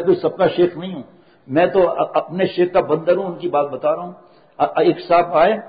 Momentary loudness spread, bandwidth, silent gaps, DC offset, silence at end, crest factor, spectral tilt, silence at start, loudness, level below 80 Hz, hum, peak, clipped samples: 8 LU; 5 kHz; none; under 0.1%; 0 s; 14 dB; -11.5 dB/octave; 0 s; -18 LUFS; -56 dBFS; none; -4 dBFS; under 0.1%